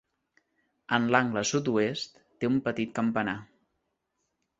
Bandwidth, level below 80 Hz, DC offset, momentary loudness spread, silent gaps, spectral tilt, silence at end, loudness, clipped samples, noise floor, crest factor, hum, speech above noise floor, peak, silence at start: 8 kHz; -66 dBFS; under 0.1%; 10 LU; none; -4.5 dB/octave; 1.15 s; -28 LUFS; under 0.1%; -80 dBFS; 26 dB; none; 52 dB; -6 dBFS; 0.9 s